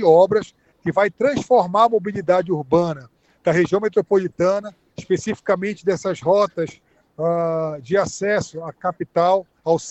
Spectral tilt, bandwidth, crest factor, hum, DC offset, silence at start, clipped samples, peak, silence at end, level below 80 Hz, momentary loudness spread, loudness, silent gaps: -6 dB/octave; 8.4 kHz; 18 dB; none; under 0.1%; 0 s; under 0.1%; -2 dBFS; 0 s; -58 dBFS; 10 LU; -20 LUFS; none